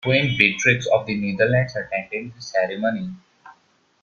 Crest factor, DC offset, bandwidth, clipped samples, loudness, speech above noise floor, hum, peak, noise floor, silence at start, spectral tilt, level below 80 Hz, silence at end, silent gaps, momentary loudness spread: 22 dB; under 0.1%; 7.2 kHz; under 0.1%; -21 LUFS; 39 dB; none; 0 dBFS; -60 dBFS; 0.05 s; -5 dB/octave; -56 dBFS; 0.5 s; none; 14 LU